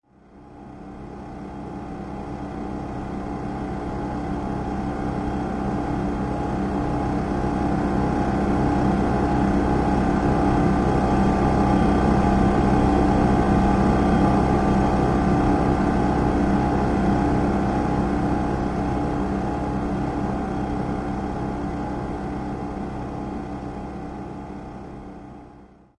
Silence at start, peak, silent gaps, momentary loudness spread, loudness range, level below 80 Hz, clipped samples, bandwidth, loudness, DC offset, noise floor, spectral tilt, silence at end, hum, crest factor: 0.35 s; -6 dBFS; none; 15 LU; 12 LU; -32 dBFS; under 0.1%; 10.5 kHz; -23 LUFS; under 0.1%; -48 dBFS; -8 dB/octave; 0.35 s; none; 16 dB